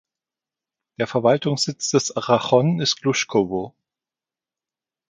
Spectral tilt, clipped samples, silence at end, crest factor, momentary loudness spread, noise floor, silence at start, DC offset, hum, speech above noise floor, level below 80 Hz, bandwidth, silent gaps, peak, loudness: -4.5 dB/octave; under 0.1%; 1.4 s; 20 dB; 8 LU; under -90 dBFS; 1 s; under 0.1%; none; over 70 dB; -62 dBFS; 9.6 kHz; none; -2 dBFS; -20 LUFS